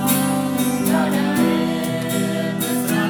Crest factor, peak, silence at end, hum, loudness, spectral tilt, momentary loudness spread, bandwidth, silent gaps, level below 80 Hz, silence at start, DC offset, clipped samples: 14 dB; -6 dBFS; 0 s; none; -20 LUFS; -5 dB/octave; 4 LU; over 20 kHz; none; -56 dBFS; 0 s; under 0.1%; under 0.1%